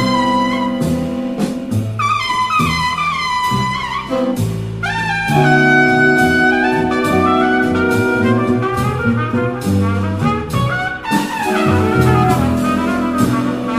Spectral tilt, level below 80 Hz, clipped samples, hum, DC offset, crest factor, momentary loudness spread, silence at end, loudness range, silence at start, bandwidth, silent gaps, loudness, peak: -6 dB/octave; -36 dBFS; under 0.1%; none; under 0.1%; 14 dB; 8 LU; 0 s; 4 LU; 0 s; 16 kHz; none; -15 LUFS; 0 dBFS